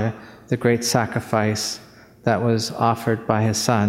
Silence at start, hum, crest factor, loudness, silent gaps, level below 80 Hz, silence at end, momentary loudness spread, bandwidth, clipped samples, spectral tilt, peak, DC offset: 0 s; none; 20 dB; -21 LUFS; none; -56 dBFS; 0 s; 8 LU; 16 kHz; under 0.1%; -5 dB/octave; 0 dBFS; under 0.1%